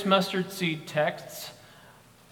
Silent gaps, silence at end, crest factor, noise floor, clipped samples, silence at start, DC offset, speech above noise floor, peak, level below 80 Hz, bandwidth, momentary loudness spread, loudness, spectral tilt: none; 0.4 s; 22 dB; -54 dBFS; under 0.1%; 0 s; under 0.1%; 26 dB; -8 dBFS; -70 dBFS; 19 kHz; 17 LU; -29 LUFS; -4.5 dB/octave